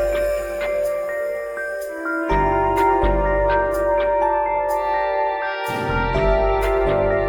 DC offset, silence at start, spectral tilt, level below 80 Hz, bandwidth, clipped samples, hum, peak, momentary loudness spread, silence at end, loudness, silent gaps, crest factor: under 0.1%; 0 s; -6.5 dB/octave; -30 dBFS; 20 kHz; under 0.1%; none; -6 dBFS; 7 LU; 0 s; -20 LUFS; none; 14 dB